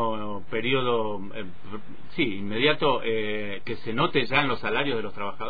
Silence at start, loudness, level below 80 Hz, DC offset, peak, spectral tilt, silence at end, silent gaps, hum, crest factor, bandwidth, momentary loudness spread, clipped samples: 0 s; -26 LUFS; -56 dBFS; 4%; -4 dBFS; -8 dB/octave; 0 s; none; none; 22 dB; 5 kHz; 16 LU; under 0.1%